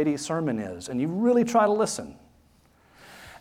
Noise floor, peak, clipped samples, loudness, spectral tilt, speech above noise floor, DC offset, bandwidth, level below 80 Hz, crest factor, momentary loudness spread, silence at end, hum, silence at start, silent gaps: -60 dBFS; -8 dBFS; under 0.1%; -25 LUFS; -5.5 dB/octave; 35 dB; under 0.1%; 15 kHz; -62 dBFS; 18 dB; 21 LU; 0.05 s; none; 0 s; none